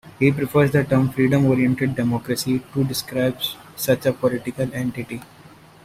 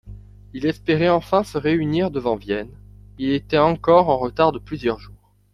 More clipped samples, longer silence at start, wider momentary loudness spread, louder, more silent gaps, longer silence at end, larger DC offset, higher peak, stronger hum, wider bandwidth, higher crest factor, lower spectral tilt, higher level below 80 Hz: neither; about the same, 0.05 s vs 0.05 s; second, 9 LU vs 12 LU; about the same, -21 LUFS vs -20 LUFS; neither; first, 0.6 s vs 0.45 s; neither; about the same, -4 dBFS vs -2 dBFS; second, none vs 50 Hz at -40 dBFS; first, 16 kHz vs 13 kHz; about the same, 18 dB vs 18 dB; second, -6 dB/octave vs -7.5 dB/octave; second, -52 dBFS vs -44 dBFS